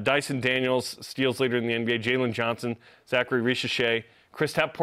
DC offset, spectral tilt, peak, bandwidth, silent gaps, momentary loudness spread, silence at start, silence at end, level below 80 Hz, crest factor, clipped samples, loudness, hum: under 0.1%; -4.5 dB/octave; -8 dBFS; 15.5 kHz; none; 7 LU; 0 s; 0 s; -66 dBFS; 18 dB; under 0.1%; -26 LUFS; none